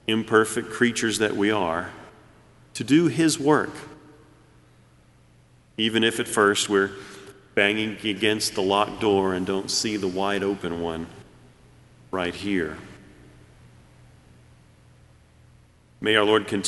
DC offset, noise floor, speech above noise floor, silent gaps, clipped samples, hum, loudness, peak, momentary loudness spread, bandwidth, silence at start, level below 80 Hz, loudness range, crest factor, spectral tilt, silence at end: under 0.1%; -56 dBFS; 33 dB; none; under 0.1%; none; -23 LUFS; -2 dBFS; 16 LU; 11.5 kHz; 0.1 s; -58 dBFS; 10 LU; 22 dB; -3.5 dB/octave; 0 s